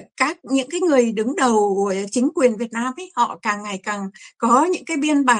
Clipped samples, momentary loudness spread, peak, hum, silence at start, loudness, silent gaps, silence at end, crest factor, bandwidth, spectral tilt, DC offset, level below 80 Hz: under 0.1%; 9 LU; -2 dBFS; none; 0 s; -20 LUFS; none; 0 s; 18 dB; 11 kHz; -4 dB/octave; under 0.1%; -66 dBFS